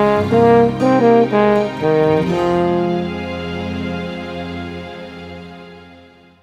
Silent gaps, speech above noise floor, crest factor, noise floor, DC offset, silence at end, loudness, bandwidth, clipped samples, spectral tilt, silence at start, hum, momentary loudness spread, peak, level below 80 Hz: none; 32 dB; 16 dB; -44 dBFS; under 0.1%; 0.45 s; -16 LUFS; 10 kHz; under 0.1%; -7.5 dB/octave; 0 s; none; 20 LU; 0 dBFS; -44 dBFS